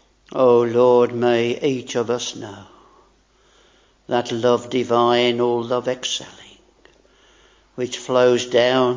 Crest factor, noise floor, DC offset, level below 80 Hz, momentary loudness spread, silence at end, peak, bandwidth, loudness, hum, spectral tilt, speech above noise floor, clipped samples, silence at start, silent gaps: 18 dB; -57 dBFS; under 0.1%; -62 dBFS; 13 LU; 0 s; -2 dBFS; 7.6 kHz; -19 LUFS; none; -4.5 dB/octave; 39 dB; under 0.1%; 0.3 s; none